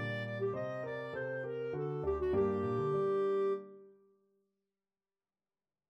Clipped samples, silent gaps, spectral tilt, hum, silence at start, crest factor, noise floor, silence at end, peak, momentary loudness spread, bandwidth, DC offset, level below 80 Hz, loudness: under 0.1%; none; -8.5 dB/octave; none; 0 s; 14 dB; under -90 dBFS; 2 s; -22 dBFS; 8 LU; 6 kHz; under 0.1%; -60 dBFS; -36 LUFS